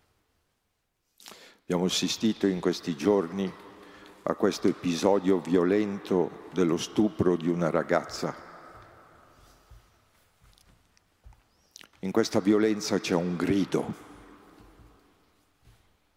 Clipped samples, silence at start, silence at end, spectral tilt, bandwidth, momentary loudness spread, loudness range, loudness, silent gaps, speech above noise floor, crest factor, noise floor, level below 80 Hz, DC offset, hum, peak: under 0.1%; 1.25 s; 2.05 s; -5.5 dB/octave; 16 kHz; 20 LU; 7 LU; -27 LUFS; none; 51 dB; 20 dB; -77 dBFS; -64 dBFS; under 0.1%; none; -10 dBFS